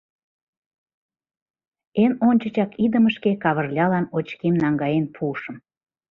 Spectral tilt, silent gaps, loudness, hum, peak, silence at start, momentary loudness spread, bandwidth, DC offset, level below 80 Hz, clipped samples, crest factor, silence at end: -9.5 dB/octave; none; -21 LUFS; none; -6 dBFS; 1.95 s; 9 LU; 5.2 kHz; under 0.1%; -62 dBFS; under 0.1%; 16 dB; 0.55 s